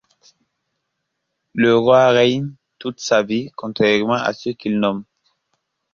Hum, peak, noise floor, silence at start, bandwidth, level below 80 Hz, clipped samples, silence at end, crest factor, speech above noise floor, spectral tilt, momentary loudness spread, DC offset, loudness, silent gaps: none; -2 dBFS; -76 dBFS; 1.55 s; 7.4 kHz; -60 dBFS; under 0.1%; 0.9 s; 18 dB; 59 dB; -5.5 dB/octave; 18 LU; under 0.1%; -17 LUFS; none